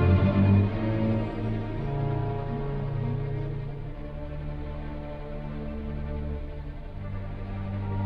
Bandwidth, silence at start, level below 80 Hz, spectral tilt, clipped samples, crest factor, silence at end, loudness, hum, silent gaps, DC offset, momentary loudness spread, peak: 5 kHz; 0 s; -36 dBFS; -10.5 dB/octave; under 0.1%; 18 dB; 0 s; -30 LUFS; none; none; under 0.1%; 16 LU; -10 dBFS